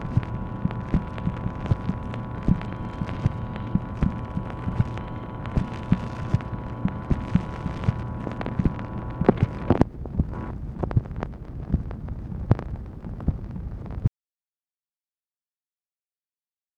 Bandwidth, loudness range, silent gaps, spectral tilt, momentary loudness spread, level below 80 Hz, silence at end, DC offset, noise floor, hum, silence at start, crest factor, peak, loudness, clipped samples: 7.2 kHz; 5 LU; none; -9.5 dB/octave; 11 LU; -36 dBFS; 2.7 s; under 0.1%; under -90 dBFS; none; 0 s; 26 dB; 0 dBFS; -28 LUFS; under 0.1%